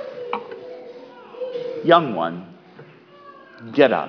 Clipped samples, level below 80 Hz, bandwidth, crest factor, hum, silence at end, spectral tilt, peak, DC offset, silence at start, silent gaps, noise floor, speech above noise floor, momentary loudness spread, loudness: under 0.1%; -76 dBFS; 5.4 kHz; 22 dB; none; 0 s; -7.5 dB/octave; 0 dBFS; under 0.1%; 0 s; none; -46 dBFS; 28 dB; 25 LU; -21 LUFS